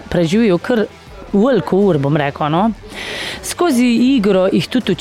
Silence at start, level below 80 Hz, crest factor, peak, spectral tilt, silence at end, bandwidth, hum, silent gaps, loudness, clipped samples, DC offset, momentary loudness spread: 0 s; -42 dBFS; 12 dB; -2 dBFS; -6 dB/octave; 0 s; 15.5 kHz; none; none; -15 LUFS; under 0.1%; 0.2%; 10 LU